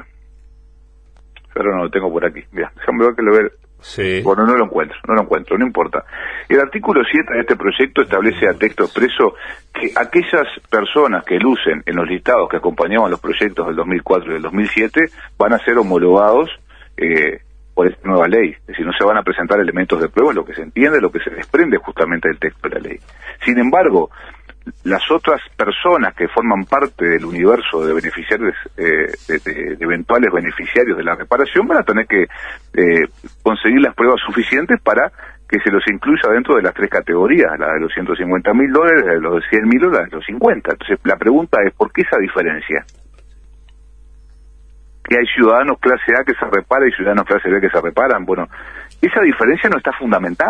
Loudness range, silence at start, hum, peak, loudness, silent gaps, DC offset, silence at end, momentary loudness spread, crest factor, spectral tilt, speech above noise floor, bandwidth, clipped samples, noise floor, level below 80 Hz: 3 LU; 1.55 s; none; 0 dBFS; -15 LUFS; none; under 0.1%; 0 s; 8 LU; 14 dB; -6.5 dB/octave; 30 dB; 9 kHz; under 0.1%; -45 dBFS; -44 dBFS